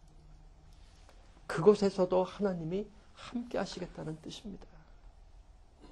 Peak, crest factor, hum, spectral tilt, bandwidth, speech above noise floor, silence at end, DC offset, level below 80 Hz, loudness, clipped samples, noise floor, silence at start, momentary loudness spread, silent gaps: -12 dBFS; 24 dB; none; -6.5 dB/octave; 10 kHz; 24 dB; 0 s; under 0.1%; -56 dBFS; -33 LUFS; under 0.1%; -57 dBFS; 0.15 s; 22 LU; none